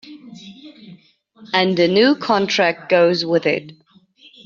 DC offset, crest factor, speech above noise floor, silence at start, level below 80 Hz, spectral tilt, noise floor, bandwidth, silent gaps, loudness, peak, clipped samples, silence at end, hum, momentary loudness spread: under 0.1%; 16 dB; 34 dB; 0.05 s; -64 dBFS; -3 dB/octave; -50 dBFS; 7.2 kHz; none; -17 LUFS; -2 dBFS; under 0.1%; 0.75 s; none; 24 LU